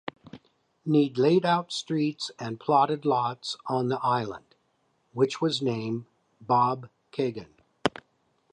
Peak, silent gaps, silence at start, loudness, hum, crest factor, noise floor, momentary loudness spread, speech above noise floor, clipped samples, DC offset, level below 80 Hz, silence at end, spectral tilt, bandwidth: -6 dBFS; none; 0.05 s; -27 LUFS; none; 22 dB; -71 dBFS; 14 LU; 45 dB; under 0.1%; under 0.1%; -68 dBFS; 0.65 s; -6 dB/octave; 11 kHz